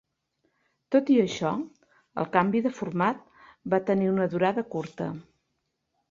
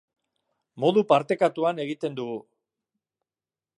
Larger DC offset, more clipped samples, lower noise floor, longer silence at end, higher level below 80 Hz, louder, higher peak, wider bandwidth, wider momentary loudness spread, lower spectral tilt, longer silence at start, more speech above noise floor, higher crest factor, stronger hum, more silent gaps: neither; neither; second, -79 dBFS vs under -90 dBFS; second, 0.9 s vs 1.35 s; first, -68 dBFS vs -80 dBFS; about the same, -26 LUFS vs -25 LUFS; about the same, -6 dBFS vs -4 dBFS; second, 7.4 kHz vs 11 kHz; about the same, 15 LU vs 13 LU; about the same, -7 dB/octave vs -6.5 dB/octave; first, 0.9 s vs 0.75 s; second, 53 dB vs over 66 dB; about the same, 22 dB vs 22 dB; neither; neither